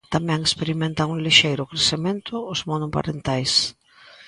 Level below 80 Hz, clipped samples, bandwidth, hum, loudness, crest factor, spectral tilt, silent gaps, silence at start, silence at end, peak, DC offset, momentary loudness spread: -50 dBFS; under 0.1%; 11.5 kHz; none; -21 LUFS; 22 dB; -3.5 dB/octave; none; 0.1 s; 0 s; 0 dBFS; under 0.1%; 11 LU